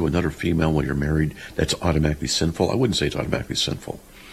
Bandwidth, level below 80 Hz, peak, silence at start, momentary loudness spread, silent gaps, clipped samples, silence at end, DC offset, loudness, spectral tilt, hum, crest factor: 14.5 kHz; -34 dBFS; -4 dBFS; 0 s; 6 LU; none; under 0.1%; 0 s; under 0.1%; -23 LUFS; -5 dB/octave; none; 18 dB